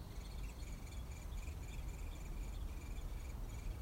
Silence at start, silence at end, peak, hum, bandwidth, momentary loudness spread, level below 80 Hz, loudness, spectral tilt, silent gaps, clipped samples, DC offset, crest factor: 0 s; 0 s; -34 dBFS; none; 16 kHz; 1 LU; -46 dBFS; -50 LUFS; -5 dB/octave; none; under 0.1%; under 0.1%; 12 dB